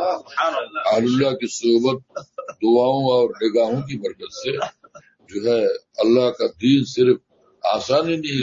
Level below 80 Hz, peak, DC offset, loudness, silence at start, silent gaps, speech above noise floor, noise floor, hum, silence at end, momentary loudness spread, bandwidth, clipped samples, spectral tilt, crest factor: -64 dBFS; -4 dBFS; under 0.1%; -20 LUFS; 0 s; none; 29 dB; -49 dBFS; none; 0 s; 12 LU; 7.8 kHz; under 0.1%; -5.5 dB/octave; 16 dB